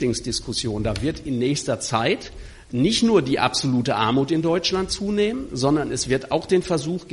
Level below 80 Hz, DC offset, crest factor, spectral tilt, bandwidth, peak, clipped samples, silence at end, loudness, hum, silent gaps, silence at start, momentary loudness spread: -42 dBFS; under 0.1%; 18 dB; -4.5 dB/octave; 11.5 kHz; -4 dBFS; under 0.1%; 0 s; -22 LUFS; none; none; 0 s; 6 LU